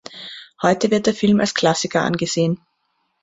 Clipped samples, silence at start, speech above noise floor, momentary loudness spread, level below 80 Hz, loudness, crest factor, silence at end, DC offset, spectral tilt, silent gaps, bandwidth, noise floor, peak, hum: under 0.1%; 0.1 s; 51 dB; 15 LU; -56 dBFS; -19 LUFS; 18 dB; 0.65 s; under 0.1%; -4.5 dB/octave; none; 8 kHz; -69 dBFS; -2 dBFS; none